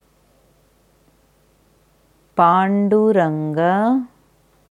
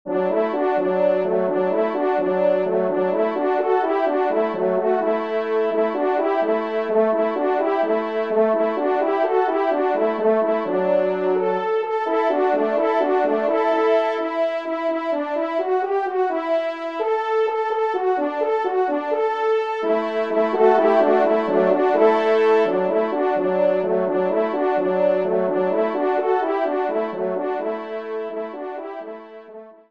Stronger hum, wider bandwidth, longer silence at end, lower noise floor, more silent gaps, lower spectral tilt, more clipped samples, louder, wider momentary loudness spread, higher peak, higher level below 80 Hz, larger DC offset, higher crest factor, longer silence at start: neither; first, 10.5 kHz vs 6.6 kHz; first, 0.65 s vs 0.2 s; first, -57 dBFS vs -41 dBFS; neither; about the same, -8.5 dB/octave vs -7.5 dB/octave; neither; first, -17 LUFS vs -20 LUFS; about the same, 8 LU vs 6 LU; about the same, -2 dBFS vs -4 dBFS; first, -64 dBFS vs -72 dBFS; second, under 0.1% vs 0.2%; about the same, 18 dB vs 16 dB; first, 2.35 s vs 0.05 s